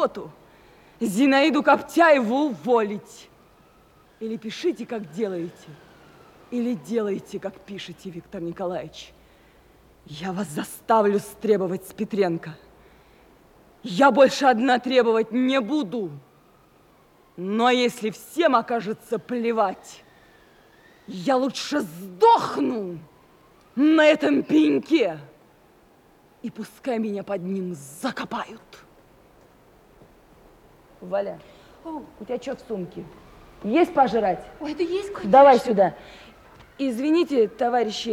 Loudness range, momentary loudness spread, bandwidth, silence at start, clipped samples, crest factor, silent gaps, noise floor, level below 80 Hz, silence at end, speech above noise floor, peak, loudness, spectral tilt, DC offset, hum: 13 LU; 19 LU; 16.5 kHz; 0 s; under 0.1%; 20 dB; none; -56 dBFS; -62 dBFS; 0 s; 34 dB; -4 dBFS; -22 LUFS; -5 dB/octave; under 0.1%; none